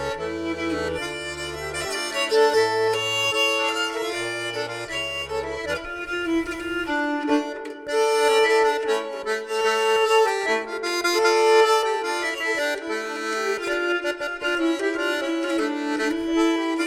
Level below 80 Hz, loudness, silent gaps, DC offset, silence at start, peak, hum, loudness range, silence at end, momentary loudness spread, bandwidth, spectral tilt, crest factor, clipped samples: -52 dBFS; -23 LUFS; none; under 0.1%; 0 s; -4 dBFS; none; 6 LU; 0 s; 10 LU; 15.5 kHz; -2.5 dB/octave; 18 dB; under 0.1%